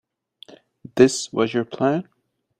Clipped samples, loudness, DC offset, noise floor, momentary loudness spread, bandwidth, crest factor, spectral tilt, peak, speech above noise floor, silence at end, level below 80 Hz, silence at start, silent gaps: under 0.1%; -21 LUFS; under 0.1%; -50 dBFS; 9 LU; 10 kHz; 22 dB; -5 dB/octave; -2 dBFS; 31 dB; 0.55 s; -60 dBFS; 0.95 s; none